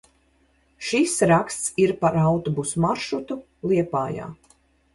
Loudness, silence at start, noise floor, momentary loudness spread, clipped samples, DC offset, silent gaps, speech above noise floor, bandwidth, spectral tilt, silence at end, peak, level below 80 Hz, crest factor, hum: -22 LUFS; 0.8 s; -63 dBFS; 12 LU; under 0.1%; under 0.1%; none; 40 dB; 11.5 kHz; -5.5 dB/octave; 0.6 s; -6 dBFS; -54 dBFS; 18 dB; none